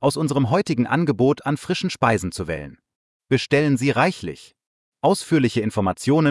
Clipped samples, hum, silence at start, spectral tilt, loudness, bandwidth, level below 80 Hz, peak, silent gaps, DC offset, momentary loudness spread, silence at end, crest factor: under 0.1%; none; 0 s; -6 dB/octave; -21 LUFS; 12 kHz; -54 dBFS; -4 dBFS; 2.96-3.20 s, 4.67-4.92 s; under 0.1%; 10 LU; 0 s; 16 dB